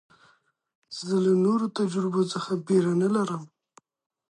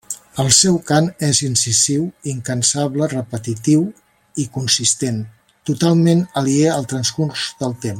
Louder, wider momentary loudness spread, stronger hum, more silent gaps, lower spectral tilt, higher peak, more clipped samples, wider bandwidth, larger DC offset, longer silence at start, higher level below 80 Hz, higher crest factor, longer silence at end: second, -25 LUFS vs -17 LUFS; about the same, 11 LU vs 12 LU; neither; neither; first, -6.5 dB/octave vs -4 dB/octave; second, -12 dBFS vs 0 dBFS; neither; second, 11 kHz vs 16.5 kHz; neither; first, 0.9 s vs 0.1 s; second, -76 dBFS vs -54 dBFS; about the same, 16 dB vs 18 dB; first, 0.85 s vs 0 s